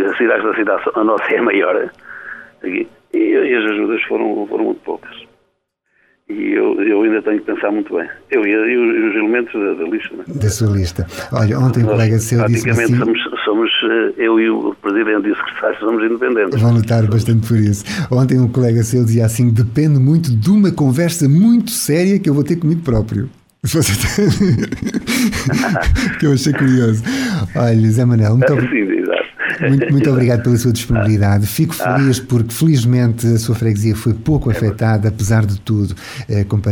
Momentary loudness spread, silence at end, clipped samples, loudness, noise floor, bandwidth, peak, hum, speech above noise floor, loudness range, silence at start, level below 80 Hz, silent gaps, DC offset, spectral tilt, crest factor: 7 LU; 0 s; under 0.1%; -15 LUFS; -66 dBFS; 17.5 kHz; -2 dBFS; none; 52 dB; 5 LU; 0 s; -36 dBFS; none; under 0.1%; -6.5 dB/octave; 12 dB